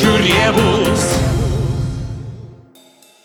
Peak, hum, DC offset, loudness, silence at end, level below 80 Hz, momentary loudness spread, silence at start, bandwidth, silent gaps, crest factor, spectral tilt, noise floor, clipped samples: 0 dBFS; none; under 0.1%; -15 LUFS; 0.7 s; -28 dBFS; 17 LU; 0 s; over 20 kHz; none; 16 dB; -5 dB/octave; -47 dBFS; under 0.1%